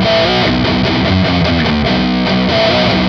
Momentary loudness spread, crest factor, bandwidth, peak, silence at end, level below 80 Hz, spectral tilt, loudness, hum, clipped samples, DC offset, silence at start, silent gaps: 2 LU; 12 dB; 7 kHz; 0 dBFS; 0 s; -28 dBFS; -6.5 dB/octave; -12 LUFS; none; under 0.1%; under 0.1%; 0 s; none